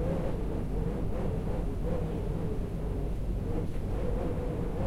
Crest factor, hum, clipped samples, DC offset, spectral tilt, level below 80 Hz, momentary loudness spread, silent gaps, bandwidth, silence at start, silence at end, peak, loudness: 12 dB; none; under 0.1%; under 0.1%; -9 dB/octave; -34 dBFS; 2 LU; none; 13 kHz; 0 s; 0 s; -18 dBFS; -34 LUFS